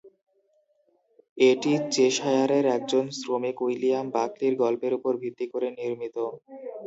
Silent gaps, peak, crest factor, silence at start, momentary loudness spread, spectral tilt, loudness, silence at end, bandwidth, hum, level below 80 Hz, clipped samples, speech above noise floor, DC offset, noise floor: 1.29-1.36 s; -8 dBFS; 18 dB; 0.05 s; 10 LU; -4.5 dB/octave; -26 LUFS; 0 s; 8 kHz; none; -78 dBFS; under 0.1%; 43 dB; under 0.1%; -68 dBFS